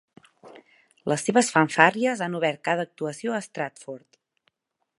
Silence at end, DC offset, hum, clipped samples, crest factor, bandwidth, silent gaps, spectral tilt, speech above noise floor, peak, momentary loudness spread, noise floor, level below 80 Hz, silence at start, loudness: 1 s; under 0.1%; none; under 0.1%; 26 dB; 11.5 kHz; none; -4 dB/octave; 55 dB; -2 dBFS; 16 LU; -79 dBFS; -76 dBFS; 0.45 s; -24 LUFS